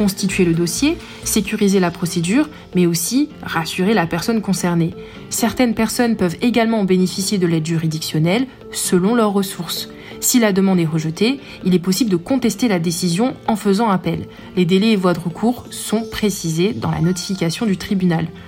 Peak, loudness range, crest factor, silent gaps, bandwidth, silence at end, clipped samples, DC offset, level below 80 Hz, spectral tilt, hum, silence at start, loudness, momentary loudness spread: -4 dBFS; 1 LU; 14 dB; none; 17 kHz; 0 s; under 0.1%; under 0.1%; -46 dBFS; -5 dB/octave; none; 0 s; -18 LUFS; 6 LU